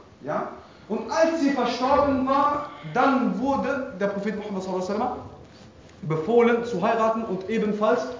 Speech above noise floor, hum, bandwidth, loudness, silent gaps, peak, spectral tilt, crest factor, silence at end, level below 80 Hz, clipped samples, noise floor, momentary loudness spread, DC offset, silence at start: 24 dB; none; 7.6 kHz; -24 LUFS; none; -6 dBFS; -6 dB/octave; 18 dB; 0 s; -54 dBFS; under 0.1%; -48 dBFS; 10 LU; under 0.1%; 0.2 s